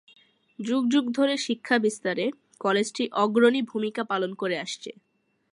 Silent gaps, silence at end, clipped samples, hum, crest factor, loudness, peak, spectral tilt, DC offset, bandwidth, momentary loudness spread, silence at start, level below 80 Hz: none; 0.6 s; under 0.1%; none; 20 dB; -25 LUFS; -6 dBFS; -4 dB/octave; under 0.1%; 11.5 kHz; 10 LU; 0.6 s; -78 dBFS